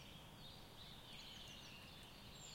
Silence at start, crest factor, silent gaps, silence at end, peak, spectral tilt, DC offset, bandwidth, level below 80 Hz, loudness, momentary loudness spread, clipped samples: 0 s; 14 dB; none; 0 s; -44 dBFS; -3 dB/octave; under 0.1%; 16.5 kHz; -68 dBFS; -56 LUFS; 3 LU; under 0.1%